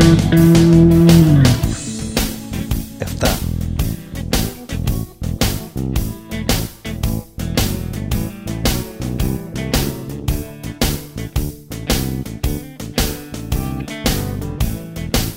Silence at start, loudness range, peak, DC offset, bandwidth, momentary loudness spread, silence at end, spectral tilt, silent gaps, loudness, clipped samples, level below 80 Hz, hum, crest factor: 0 s; 8 LU; 0 dBFS; 0.2%; 16.5 kHz; 15 LU; 0 s; -5.5 dB/octave; none; -18 LUFS; under 0.1%; -26 dBFS; none; 16 dB